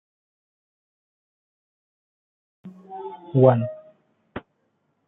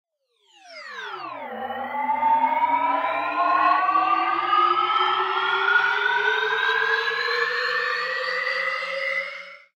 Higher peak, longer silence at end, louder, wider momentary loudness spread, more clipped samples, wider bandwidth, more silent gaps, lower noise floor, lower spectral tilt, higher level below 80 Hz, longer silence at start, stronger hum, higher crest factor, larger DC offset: first, -2 dBFS vs -8 dBFS; first, 0.7 s vs 0.2 s; about the same, -20 LUFS vs -22 LUFS; first, 23 LU vs 14 LU; neither; second, 3.9 kHz vs 16 kHz; neither; first, -71 dBFS vs -65 dBFS; first, -12.5 dB/octave vs -2 dB/octave; first, -66 dBFS vs -82 dBFS; first, 2.65 s vs 0.65 s; neither; first, 26 dB vs 16 dB; neither